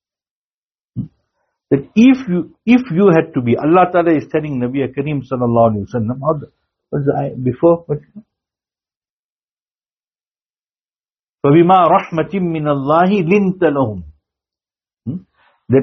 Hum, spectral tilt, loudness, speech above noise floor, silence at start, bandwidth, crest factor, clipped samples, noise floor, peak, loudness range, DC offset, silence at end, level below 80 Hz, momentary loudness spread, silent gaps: none; -7 dB/octave; -15 LUFS; over 76 dB; 0.95 s; 6.4 kHz; 16 dB; under 0.1%; under -90 dBFS; 0 dBFS; 7 LU; under 0.1%; 0 s; -52 dBFS; 16 LU; 8.96-9.01 s, 9.10-9.57 s, 9.71-9.75 s, 10.07-10.11 s, 10.28-10.35 s, 10.50-10.54 s, 11.29-11.38 s